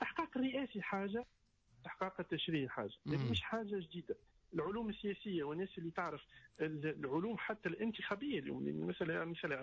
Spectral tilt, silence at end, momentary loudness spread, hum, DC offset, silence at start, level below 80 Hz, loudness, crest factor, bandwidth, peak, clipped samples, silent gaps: -7 dB/octave; 0 s; 7 LU; none; under 0.1%; 0 s; -66 dBFS; -42 LUFS; 14 dB; 7.6 kHz; -28 dBFS; under 0.1%; none